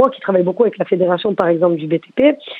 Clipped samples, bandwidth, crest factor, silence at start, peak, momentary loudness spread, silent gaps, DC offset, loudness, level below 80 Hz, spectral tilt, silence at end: under 0.1%; 4.6 kHz; 16 dB; 0 s; 0 dBFS; 3 LU; none; under 0.1%; -16 LUFS; -60 dBFS; -9 dB/octave; 0 s